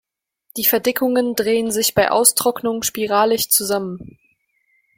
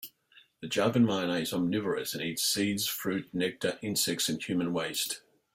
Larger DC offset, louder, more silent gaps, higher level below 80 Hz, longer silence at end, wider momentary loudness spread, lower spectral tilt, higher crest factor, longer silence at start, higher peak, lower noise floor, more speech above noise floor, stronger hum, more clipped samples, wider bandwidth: neither; first, -17 LUFS vs -30 LUFS; neither; first, -56 dBFS vs -68 dBFS; first, 0.95 s vs 0.35 s; about the same, 9 LU vs 7 LU; about the same, -2.5 dB/octave vs -3.5 dB/octave; about the same, 20 dB vs 18 dB; first, 0.55 s vs 0 s; first, 0 dBFS vs -14 dBFS; about the same, -64 dBFS vs -62 dBFS; first, 46 dB vs 32 dB; neither; neither; about the same, 16.5 kHz vs 16 kHz